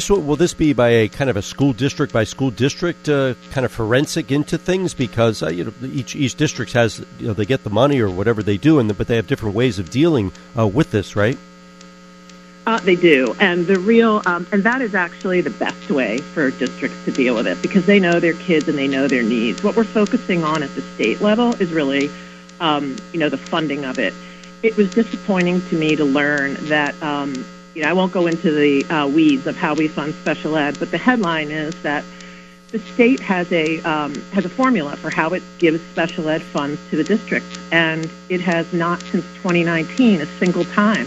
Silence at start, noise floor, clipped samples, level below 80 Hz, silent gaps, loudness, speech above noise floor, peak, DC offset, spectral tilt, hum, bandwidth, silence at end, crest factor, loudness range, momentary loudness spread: 0 s; -41 dBFS; under 0.1%; -46 dBFS; none; -18 LUFS; 24 dB; 0 dBFS; under 0.1%; -6 dB/octave; none; 13 kHz; 0 s; 18 dB; 3 LU; 8 LU